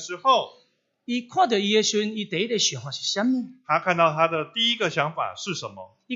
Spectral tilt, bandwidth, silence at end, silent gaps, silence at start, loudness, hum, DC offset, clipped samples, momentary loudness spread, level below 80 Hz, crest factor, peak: -3 dB/octave; 8 kHz; 0 s; none; 0 s; -23 LUFS; none; under 0.1%; under 0.1%; 10 LU; -76 dBFS; 20 dB; -6 dBFS